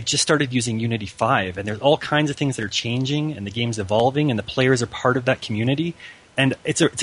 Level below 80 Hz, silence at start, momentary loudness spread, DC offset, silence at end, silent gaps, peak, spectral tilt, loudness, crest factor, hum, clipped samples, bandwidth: -54 dBFS; 0 s; 6 LU; under 0.1%; 0 s; none; -4 dBFS; -4.5 dB/octave; -21 LUFS; 18 dB; none; under 0.1%; 11 kHz